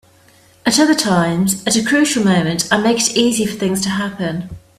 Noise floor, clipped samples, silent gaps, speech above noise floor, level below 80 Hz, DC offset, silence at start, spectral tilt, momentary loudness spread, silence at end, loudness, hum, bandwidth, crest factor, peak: -49 dBFS; under 0.1%; none; 34 dB; -50 dBFS; under 0.1%; 0.65 s; -4 dB/octave; 8 LU; 0.2 s; -15 LUFS; none; 16 kHz; 16 dB; 0 dBFS